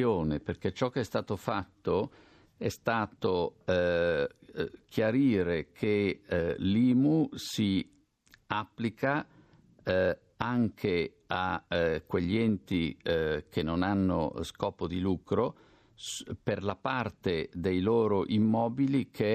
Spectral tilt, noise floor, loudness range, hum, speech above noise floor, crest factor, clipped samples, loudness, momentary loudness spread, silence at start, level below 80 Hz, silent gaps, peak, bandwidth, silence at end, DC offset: -6.5 dB/octave; -64 dBFS; 4 LU; none; 34 dB; 20 dB; under 0.1%; -31 LUFS; 8 LU; 0 s; -58 dBFS; none; -10 dBFS; 14 kHz; 0 s; under 0.1%